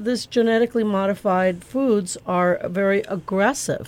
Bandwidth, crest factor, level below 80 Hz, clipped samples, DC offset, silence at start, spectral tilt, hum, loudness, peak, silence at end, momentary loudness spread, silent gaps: 16.5 kHz; 14 dB; -56 dBFS; under 0.1%; under 0.1%; 0 s; -5 dB/octave; none; -21 LUFS; -8 dBFS; 0 s; 4 LU; none